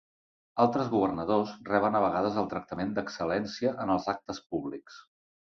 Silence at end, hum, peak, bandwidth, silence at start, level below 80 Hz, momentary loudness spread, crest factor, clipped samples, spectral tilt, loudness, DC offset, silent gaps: 0.55 s; none; -10 dBFS; 7.4 kHz; 0.55 s; -62 dBFS; 9 LU; 20 dB; under 0.1%; -6.5 dB/octave; -30 LUFS; under 0.1%; none